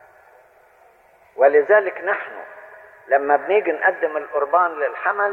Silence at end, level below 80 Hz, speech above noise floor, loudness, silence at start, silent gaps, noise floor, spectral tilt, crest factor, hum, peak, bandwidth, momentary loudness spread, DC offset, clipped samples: 0 s; -74 dBFS; 35 dB; -19 LUFS; 1.35 s; none; -53 dBFS; -6 dB/octave; 18 dB; none; -2 dBFS; 4.1 kHz; 13 LU; under 0.1%; under 0.1%